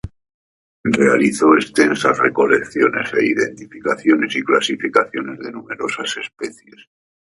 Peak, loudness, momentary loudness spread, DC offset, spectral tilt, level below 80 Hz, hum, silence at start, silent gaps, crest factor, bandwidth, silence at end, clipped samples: 0 dBFS; -17 LUFS; 14 LU; under 0.1%; -4.5 dB/octave; -52 dBFS; none; 0.05 s; 0.34-0.84 s; 18 dB; 11.5 kHz; 0.75 s; under 0.1%